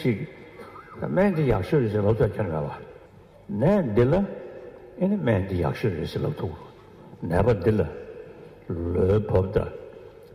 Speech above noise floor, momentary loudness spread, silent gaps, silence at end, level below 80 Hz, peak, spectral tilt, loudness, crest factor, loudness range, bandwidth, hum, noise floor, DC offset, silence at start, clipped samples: 27 dB; 21 LU; none; 0 s; -44 dBFS; -8 dBFS; -9 dB/octave; -25 LUFS; 18 dB; 3 LU; 14.5 kHz; none; -50 dBFS; under 0.1%; 0 s; under 0.1%